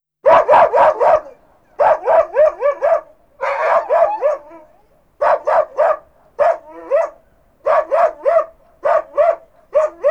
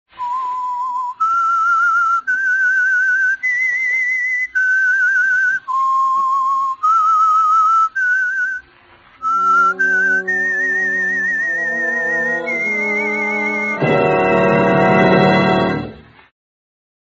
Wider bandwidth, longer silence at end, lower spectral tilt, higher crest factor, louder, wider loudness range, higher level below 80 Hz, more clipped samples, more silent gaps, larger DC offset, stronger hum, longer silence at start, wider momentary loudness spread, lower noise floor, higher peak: about the same, 7.6 kHz vs 8 kHz; second, 0 s vs 1.1 s; about the same, -4.5 dB/octave vs -3.5 dB/octave; about the same, 16 dB vs 16 dB; about the same, -15 LUFS vs -15 LUFS; about the same, 4 LU vs 2 LU; about the same, -54 dBFS vs -52 dBFS; neither; neither; first, 0.1% vs under 0.1%; neither; about the same, 0.25 s vs 0.15 s; first, 11 LU vs 7 LU; first, -54 dBFS vs -47 dBFS; about the same, 0 dBFS vs 0 dBFS